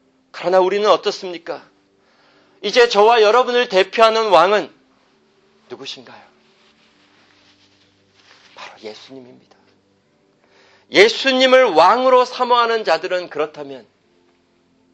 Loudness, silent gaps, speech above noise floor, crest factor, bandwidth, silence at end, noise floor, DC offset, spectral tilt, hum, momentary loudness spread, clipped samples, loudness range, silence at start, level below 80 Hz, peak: -14 LUFS; none; 44 dB; 18 dB; 8.8 kHz; 1.15 s; -59 dBFS; under 0.1%; -3 dB/octave; none; 22 LU; under 0.1%; 6 LU; 0.35 s; -66 dBFS; 0 dBFS